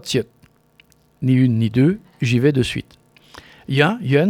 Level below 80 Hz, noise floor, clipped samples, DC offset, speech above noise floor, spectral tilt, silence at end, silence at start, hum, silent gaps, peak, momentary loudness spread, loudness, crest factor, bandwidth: -50 dBFS; -55 dBFS; under 0.1%; under 0.1%; 38 dB; -6.5 dB/octave; 0 s; 0.05 s; none; none; 0 dBFS; 10 LU; -18 LUFS; 18 dB; 13.5 kHz